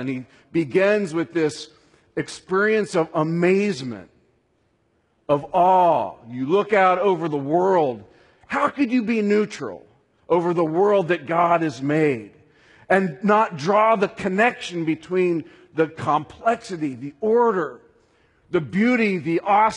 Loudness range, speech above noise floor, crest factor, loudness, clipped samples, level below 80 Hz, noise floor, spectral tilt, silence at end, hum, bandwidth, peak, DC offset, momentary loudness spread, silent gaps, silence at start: 3 LU; 45 dB; 18 dB; -21 LUFS; under 0.1%; -64 dBFS; -66 dBFS; -6.5 dB/octave; 0 s; none; 11 kHz; -4 dBFS; under 0.1%; 12 LU; none; 0 s